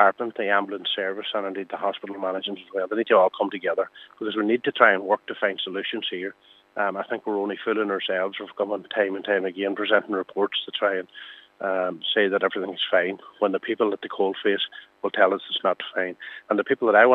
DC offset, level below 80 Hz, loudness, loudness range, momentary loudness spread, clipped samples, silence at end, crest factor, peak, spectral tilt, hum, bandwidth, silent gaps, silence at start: under 0.1%; -84 dBFS; -25 LUFS; 4 LU; 10 LU; under 0.1%; 0 s; 24 dB; 0 dBFS; -6.5 dB/octave; none; 4.5 kHz; none; 0 s